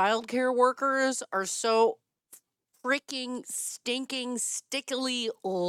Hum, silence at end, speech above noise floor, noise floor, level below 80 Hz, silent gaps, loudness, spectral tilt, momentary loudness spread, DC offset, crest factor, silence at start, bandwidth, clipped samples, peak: none; 0 s; 32 dB; -61 dBFS; -82 dBFS; none; -29 LUFS; -2 dB/octave; 9 LU; under 0.1%; 18 dB; 0 s; 16 kHz; under 0.1%; -10 dBFS